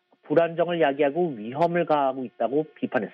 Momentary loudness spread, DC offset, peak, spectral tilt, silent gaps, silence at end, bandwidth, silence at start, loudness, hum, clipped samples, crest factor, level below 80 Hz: 6 LU; under 0.1%; -8 dBFS; -8.5 dB/octave; none; 0.05 s; 5.8 kHz; 0.3 s; -25 LUFS; none; under 0.1%; 18 dB; -74 dBFS